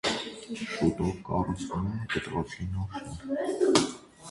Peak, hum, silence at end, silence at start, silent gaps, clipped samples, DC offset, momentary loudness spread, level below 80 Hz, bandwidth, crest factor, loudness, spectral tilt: -4 dBFS; none; 0 s; 0.05 s; none; under 0.1%; under 0.1%; 13 LU; -48 dBFS; 11.5 kHz; 26 dB; -30 LUFS; -5 dB/octave